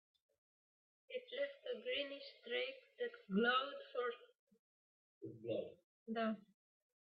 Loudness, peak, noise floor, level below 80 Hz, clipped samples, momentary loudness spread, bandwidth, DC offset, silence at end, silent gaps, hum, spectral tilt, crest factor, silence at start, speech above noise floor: -43 LUFS; -24 dBFS; under -90 dBFS; -90 dBFS; under 0.1%; 16 LU; 5.6 kHz; under 0.1%; 0.65 s; 4.39-4.47 s, 4.59-5.21 s, 5.84-6.06 s; none; -2.5 dB/octave; 20 dB; 1.1 s; over 47 dB